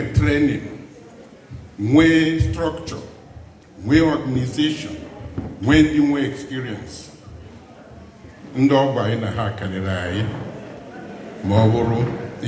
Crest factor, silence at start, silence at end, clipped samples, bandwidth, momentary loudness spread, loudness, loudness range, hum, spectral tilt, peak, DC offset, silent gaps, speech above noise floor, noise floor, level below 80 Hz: 20 dB; 0 s; 0 s; under 0.1%; 8 kHz; 21 LU; -19 LUFS; 3 LU; none; -7 dB/octave; -2 dBFS; under 0.1%; none; 24 dB; -43 dBFS; -38 dBFS